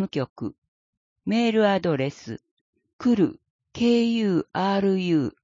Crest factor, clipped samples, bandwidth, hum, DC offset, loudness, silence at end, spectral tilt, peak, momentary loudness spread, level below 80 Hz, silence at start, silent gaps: 16 dB; under 0.1%; 7.6 kHz; none; under 0.1%; -23 LUFS; 0.15 s; -7 dB/octave; -8 dBFS; 15 LU; -62 dBFS; 0 s; 0.30-0.36 s, 0.58-0.62 s, 0.68-1.16 s, 2.51-2.73 s, 2.93-2.99 s, 3.50-3.59 s